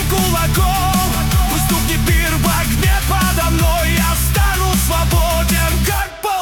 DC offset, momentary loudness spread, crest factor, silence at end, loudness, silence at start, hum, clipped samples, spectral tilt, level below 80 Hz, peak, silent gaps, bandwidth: under 0.1%; 1 LU; 10 dB; 0 s; -15 LUFS; 0 s; none; under 0.1%; -4 dB/octave; -18 dBFS; -4 dBFS; none; 19 kHz